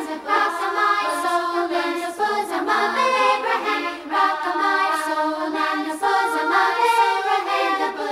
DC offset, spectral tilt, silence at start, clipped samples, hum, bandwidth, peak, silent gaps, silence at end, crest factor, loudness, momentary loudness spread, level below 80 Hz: under 0.1%; -1.5 dB/octave; 0 s; under 0.1%; none; 16 kHz; -6 dBFS; none; 0 s; 16 dB; -20 LUFS; 5 LU; -66 dBFS